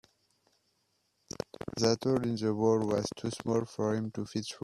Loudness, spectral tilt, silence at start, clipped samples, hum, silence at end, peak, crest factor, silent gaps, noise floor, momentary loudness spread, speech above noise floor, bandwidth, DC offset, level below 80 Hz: -31 LUFS; -5.5 dB/octave; 1.65 s; under 0.1%; none; 0.05 s; -10 dBFS; 22 dB; none; -76 dBFS; 12 LU; 45 dB; 13 kHz; under 0.1%; -66 dBFS